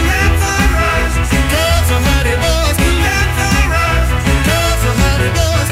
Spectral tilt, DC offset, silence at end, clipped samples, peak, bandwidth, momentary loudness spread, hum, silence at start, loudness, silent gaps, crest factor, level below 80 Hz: -4.5 dB/octave; under 0.1%; 0 s; under 0.1%; 0 dBFS; 16.5 kHz; 1 LU; none; 0 s; -13 LUFS; none; 12 dB; -16 dBFS